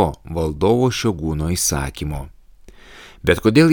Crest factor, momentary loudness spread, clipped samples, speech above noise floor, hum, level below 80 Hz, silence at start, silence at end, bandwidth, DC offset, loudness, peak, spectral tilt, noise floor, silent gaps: 18 dB; 13 LU; under 0.1%; 26 dB; none; -34 dBFS; 0 s; 0 s; over 20 kHz; under 0.1%; -19 LUFS; -2 dBFS; -5 dB/octave; -44 dBFS; none